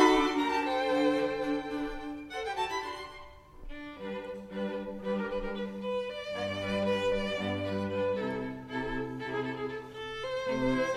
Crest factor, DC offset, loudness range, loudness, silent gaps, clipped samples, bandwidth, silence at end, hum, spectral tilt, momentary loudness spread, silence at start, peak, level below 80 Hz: 22 dB; under 0.1%; 5 LU; -33 LUFS; none; under 0.1%; 13.5 kHz; 0 s; none; -5.5 dB/octave; 12 LU; 0 s; -10 dBFS; -52 dBFS